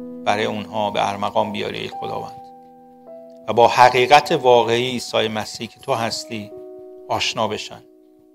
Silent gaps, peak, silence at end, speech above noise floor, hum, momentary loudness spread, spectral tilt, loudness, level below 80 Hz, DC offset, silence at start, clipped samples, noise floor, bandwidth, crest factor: none; 0 dBFS; 0.55 s; 26 dB; none; 19 LU; -4 dB/octave; -19 LUFS; -60 dBFS; under 0.1%; 0 s; under 0.1%; -45 dBFS; 16 kHz; 20 dB